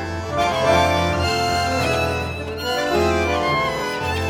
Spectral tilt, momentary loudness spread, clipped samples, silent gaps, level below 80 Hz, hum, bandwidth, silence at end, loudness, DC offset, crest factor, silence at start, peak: -4.5 dB/octave; 7 LU; under 0.1%; none; -40 dBFS; none; 19 kHz; 0 s; -20 LUFS; under 0.1%; 16 dB; 0 s; -4 dBFS